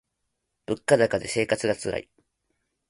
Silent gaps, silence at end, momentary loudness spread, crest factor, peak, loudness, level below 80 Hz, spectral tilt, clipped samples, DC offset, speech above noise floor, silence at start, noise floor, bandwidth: none; 0.9 s; 12 LU; 24 dB; -4 dBFS; -25 LUFS; -58 dBFS; -4.5 dB/octave; under 0.1%; under 0.1%; 55 dB; 0.7 s; -79 dBFS; 11.5 kHz